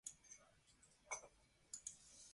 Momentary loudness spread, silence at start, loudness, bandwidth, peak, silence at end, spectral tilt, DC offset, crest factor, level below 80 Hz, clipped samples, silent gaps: 11 LU; 0.05 s; -55 LUFS; 11.5 kHz; -34 dBFS; 0 s; 0 dB/octave; under 0.1%; 26 dB; -82 dBFS; under 0.1%; none